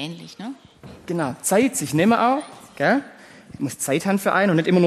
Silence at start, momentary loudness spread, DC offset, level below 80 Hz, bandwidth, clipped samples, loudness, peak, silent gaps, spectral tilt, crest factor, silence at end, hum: 0 s; 18 LU; under 0.1%; -62 dBFS; 13 kHz; under 0.1%; -21 LUFS; -4 dBFS; none; -5 dB/octave; 16 dB; 0 s; none